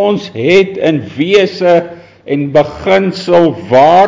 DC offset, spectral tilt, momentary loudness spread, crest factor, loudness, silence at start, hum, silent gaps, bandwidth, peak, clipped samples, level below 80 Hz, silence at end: under 0.1%; -6.5 dB/octave; 6 LU; 10 dB; -11 LUFS; 0 s; none; none; 7.6 kHz; 0 dBFS; under 0.1%; -46 dBFS; 0 s